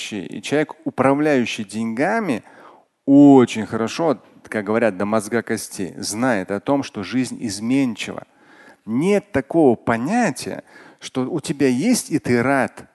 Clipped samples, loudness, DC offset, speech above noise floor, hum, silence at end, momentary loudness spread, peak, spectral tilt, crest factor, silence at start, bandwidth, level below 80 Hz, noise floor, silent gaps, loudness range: under 0.1%; -20 LUFS; under 0.1%; 29 dB; none; 0.1 s; 12 LU; 0 dBFS; -5.5 dB/octave; 18 dB; 0 s; 12.5 kHz; -58 dBFS; -48 dBFS; none; 5 LU